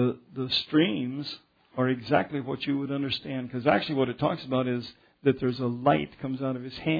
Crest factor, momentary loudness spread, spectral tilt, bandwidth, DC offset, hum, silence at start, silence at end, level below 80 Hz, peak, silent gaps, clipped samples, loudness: 20 dB; 9 LU; -8 dB/octave; 5 kHz; under 0.1%; none; 0 s; 0 s; -62 dBFS; -8 dBFS; none; under 0.1%; -28 LUFS